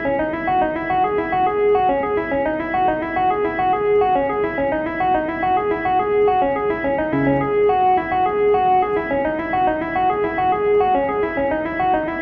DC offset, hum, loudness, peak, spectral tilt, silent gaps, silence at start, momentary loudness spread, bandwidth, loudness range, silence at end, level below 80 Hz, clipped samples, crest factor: under 0.1%; none; -19 LUFS; -8 dBFS; -8.5 dB/octave; none; 0 s; 4 LU; 5.2 kHz; 1 LU; 0 s; -44 dBFS; under 0.1%; 12 dB